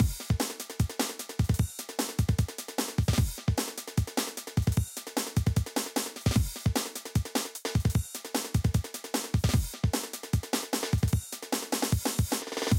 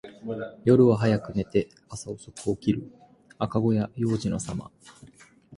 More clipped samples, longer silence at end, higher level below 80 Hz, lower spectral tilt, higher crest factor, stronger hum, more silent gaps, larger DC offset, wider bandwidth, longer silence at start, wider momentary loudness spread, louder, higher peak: neither; about the same, 0 s vs 0 s; first, -38 dBFS vs -54 dBFS; second, -4.5 dB/octave vs -7 dB/octave; about the same, 16 dB vs 18 dB; neither; neither; neither; first, 17 kHz vs 11.5 kHz; about the same, 0 s vs 0.05 s; second, 5 LU vs 18 LU; second, -30 LUFS vs -26 LUFS; second, -14 dBFS vs -8 dBFS